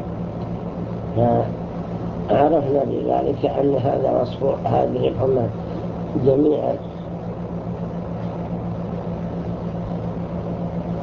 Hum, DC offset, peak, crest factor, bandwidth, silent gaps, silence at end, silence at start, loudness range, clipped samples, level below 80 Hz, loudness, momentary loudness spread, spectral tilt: none; under 0.1%; -4 dBFS; 18 dB; 6.6 kHz; none; 0 s; 0 s; 7 LU; under 0.1%; -40 dBFS; -22 LUFS; 10 LU; -10 dB/octave